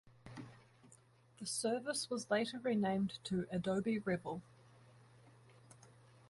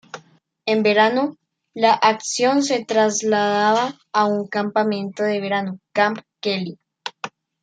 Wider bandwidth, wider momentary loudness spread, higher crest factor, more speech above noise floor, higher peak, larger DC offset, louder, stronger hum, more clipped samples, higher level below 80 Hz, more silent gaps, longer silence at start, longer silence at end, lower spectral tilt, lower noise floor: first, 11.5 kHz vs 9.4 kHz; about the same, 17 LU vs 16 LU; about the same, 18 dB vs 18 dB; second, 28 dB vs 34 dB; second, -22 dBFS vs -2 dBFS; neither; second, -39 LUFS vs -20 LUFS; neither; neither; about the same, -72 dBFS vs -72 dBFS; neither; about the same, 0.05 s vs 0.15 s; about the same, 0.45 s vs 0.35 s; about the same, -4.5 dB/octave vs -3.5 dB/octave; first, -66 dBFS vs -53 dBFS